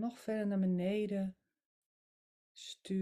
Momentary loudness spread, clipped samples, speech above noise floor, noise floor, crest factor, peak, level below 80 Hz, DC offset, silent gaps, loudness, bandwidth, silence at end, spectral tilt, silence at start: 15 LU; under 0.1%; over 54 dB; under -90 dBFS; 14 dB; -24 dBFS; -76 dBFS; under 0.1%; 1.66-2.55 s; -36 LUFS; 12.5 kHz; 0 s; -7 dB/octave; 0 s